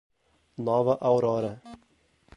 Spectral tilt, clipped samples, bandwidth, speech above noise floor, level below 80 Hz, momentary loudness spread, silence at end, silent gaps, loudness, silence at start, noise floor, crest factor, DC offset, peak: -8.5 dB/octave; under 0.1%; 10.5 kHz; 41 dB; -66 dBFS; 19 LU; 0.6 s; none; -26 LUFS; 0.6 s; -65 dBFS; 18 dB; under 0.1%; -10 dBFS